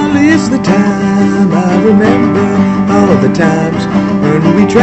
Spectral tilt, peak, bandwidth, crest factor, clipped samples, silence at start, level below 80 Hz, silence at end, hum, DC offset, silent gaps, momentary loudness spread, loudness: -7 dB/octave; 0 dBFS; 8.4 kHz; 8 dB; 0.4%; 0 s; -38 dBFS; 0 s; none; under 0.1%; none; 3 LU; -9 LUFS